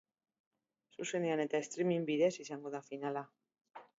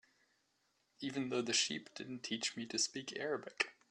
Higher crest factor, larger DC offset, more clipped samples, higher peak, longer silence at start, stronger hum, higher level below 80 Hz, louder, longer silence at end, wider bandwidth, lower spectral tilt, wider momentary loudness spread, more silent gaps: second, 18 dB vs 26 dB; neither; neither; second, -20 dBFS vs -16 dBFS; about the same, 1 s vs 1 s; neither; second, -90 dBFS vs -84 dBFS; about the same, -37 LUFS vs -39 LUFS; about the same, 0.15 s vs 0.2 s; second, 7.6 kHz vs 12.5 kHz; first, -5 dB/octave vs -2 dB/octave; about the same, 11 LU vs 11 LU; first, 3.61-3.65 s vs none